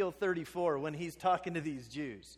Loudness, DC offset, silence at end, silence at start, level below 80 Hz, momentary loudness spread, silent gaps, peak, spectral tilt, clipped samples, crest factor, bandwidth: -36 LUFS; under 0.1%; 0 s; 0 s; -66 dBFS; 8 LU; none; -18 dBFS; -6 dB/octave; under 0.1%; 16 dB; 15.5 kHz